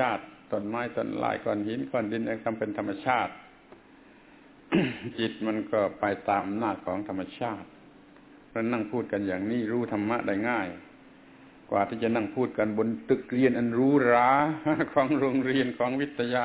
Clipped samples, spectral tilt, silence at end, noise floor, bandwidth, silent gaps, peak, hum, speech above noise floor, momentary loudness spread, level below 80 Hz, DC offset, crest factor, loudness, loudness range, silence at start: under 0.1%; -5 dB/octave; 0 s; -54 dBFS; 4 kHz; none; -10 dBFS; none; 27 dB; 9 LU; -62 dBFS; under 0.1%; 18 dB; -28 LUFS; 7 LU; 0 s